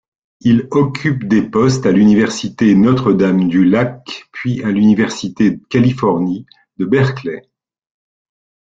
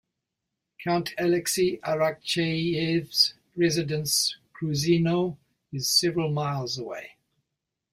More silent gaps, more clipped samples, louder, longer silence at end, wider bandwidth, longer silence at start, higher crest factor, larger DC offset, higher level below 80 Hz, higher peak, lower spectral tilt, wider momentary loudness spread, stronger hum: neither; neither; first, -14 LUFS vs -25 LUFS; first, 1.3 s vs 0.85 s; second, 7.8 kHz vs 16 kHz; second, 0.45 s vs 0.8 s; second, 12 dB vs 20 dB; neither; first, -48 dBFS vs -62 dBFS; first, -2 dBFS vs -8 dBFS; first, -7 dB/octave vs -4 dB/octave; about the same, 12 LU vs 10 LU; neither